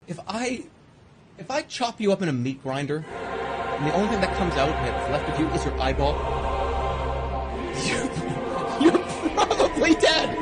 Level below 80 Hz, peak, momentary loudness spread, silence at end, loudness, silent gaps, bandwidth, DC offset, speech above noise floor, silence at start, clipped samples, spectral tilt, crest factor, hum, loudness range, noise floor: -36 dBFS; -8 dBFS; 10 LU; 0 s; -25 LUFS; none; 10 kHz; under 0.1%; 27 dB; 0.1 s; under 0.1%; -5 dB/octave; 16 dB; none; 5 LU; -52 dBFS